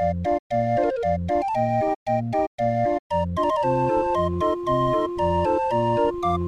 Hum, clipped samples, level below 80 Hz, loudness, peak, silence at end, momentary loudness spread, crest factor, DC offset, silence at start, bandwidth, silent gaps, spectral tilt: none; under 0.1%; -44 dBFS; -23 LUFS; -10 dBFS; 0 s; 3 LU; 12 dB; under 0.1%; 0 s; 11 kHz; 0.39-0.50 s, 1.96-2.06 s, 2.47-2.58 s, 2.99-3.10 s; -8 dB/octave